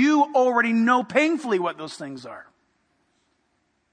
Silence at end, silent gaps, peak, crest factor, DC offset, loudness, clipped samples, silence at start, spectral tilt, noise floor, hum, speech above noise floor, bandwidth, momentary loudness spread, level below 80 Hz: 1.5 s; none; -4 dBFS; 18 dB; under 0.1%; -21 LUFS; under 0.1%; 0 s; -5 dB/octave; -70 dBFS; none; 48 dB; 10 kHz; 19 LU; -76 dBFS